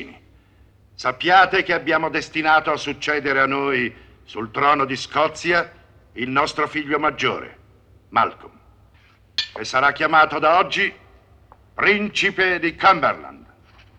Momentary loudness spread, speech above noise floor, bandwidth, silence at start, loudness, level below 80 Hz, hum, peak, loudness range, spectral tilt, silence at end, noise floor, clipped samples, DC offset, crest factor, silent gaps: 12 LU; 34 dB; 9.8 kHz; 0 s; -19 LUFS; -54 dBFS; none; -2 dBFS; 5 LU; -4 dB/octave; 0.6 s; -53 dBFS; under 0.1%; under 0.1%; 20 dB; none